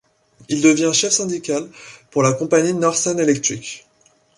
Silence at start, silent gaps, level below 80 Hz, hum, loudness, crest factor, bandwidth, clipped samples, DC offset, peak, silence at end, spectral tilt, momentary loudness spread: 0.5 s; none; -62 dBFS; none; -18 LUFS; 18 dB; 11.5 kHz; under 0.1%; under 0.1%; -2 dBFS; 0.6 s; -3.5 dB/octave; 13 LU